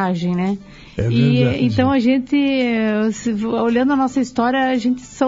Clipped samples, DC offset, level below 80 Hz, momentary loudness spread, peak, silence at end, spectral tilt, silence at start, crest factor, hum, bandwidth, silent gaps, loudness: under 0.1%; under 0.1%; -46 dBFS; 6 LU; -4 dBFS; 0 s; -7 dB/octave; 0 s; 14 dB; none; 7.8 kHz; none; -18 LUFS